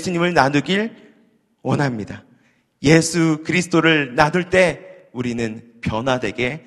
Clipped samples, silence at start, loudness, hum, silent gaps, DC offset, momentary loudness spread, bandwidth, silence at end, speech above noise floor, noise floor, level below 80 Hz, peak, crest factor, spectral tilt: under 0.1%; 0 s; -18 LUFS; none; none; under 0.1%; 14 LU; 12.5 kHz; 0.05 s; 40 dB; -58 dBFS; -48 dBFS; 0 dBFS; 20 dB; -5 dB/octave